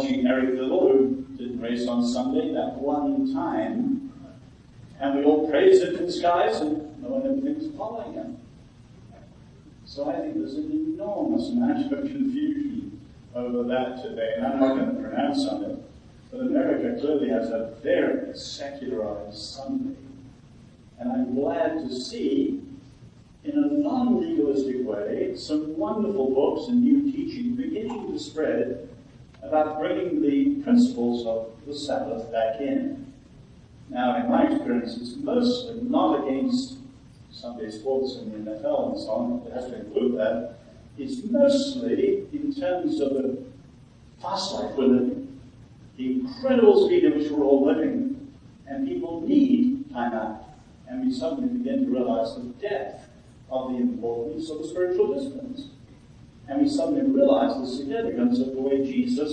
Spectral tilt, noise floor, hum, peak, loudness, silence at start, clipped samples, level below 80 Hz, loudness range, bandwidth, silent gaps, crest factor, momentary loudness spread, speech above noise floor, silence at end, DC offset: -6 dB/octave; -50 dBFS; none; -4 dBFS; -25 LUFS; 0 s; under 0.1%; -56 dBFS; 6 LU; 9.2 kHz; none; 20 dB; 14 LU; 26 dB; 0 s; under 0.1%